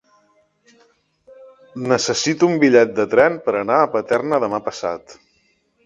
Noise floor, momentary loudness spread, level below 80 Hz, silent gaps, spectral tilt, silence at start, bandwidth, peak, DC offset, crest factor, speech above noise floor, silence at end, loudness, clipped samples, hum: -63 dBFS; 13 LU; -60 dBFS; none; -4.5 dB/octave; 1.4 s; 9.6 kHz; 0 dBFS; under 0.1%; 20 dB; 45 dB; 0.75 s; -17 LUFS; under 0.1%; none